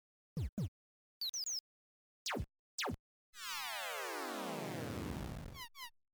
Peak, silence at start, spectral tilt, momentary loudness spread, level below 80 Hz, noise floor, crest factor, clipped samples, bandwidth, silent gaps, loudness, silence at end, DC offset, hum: -28 dBFS; 0.35 s; -3 dB/octave; 9 LU; -56 dBFS; under -90 dBFS; 16 dB; under 0.1%; over 20 kHz; 0.49-0.57 s, 0.68-1.21 s, 1.29-1.33 s, 1.60-2.26 s, 2.59-2.78 s, 2.99-3.33 s; -43 LUFS; 0.25 s; under 0.1%; none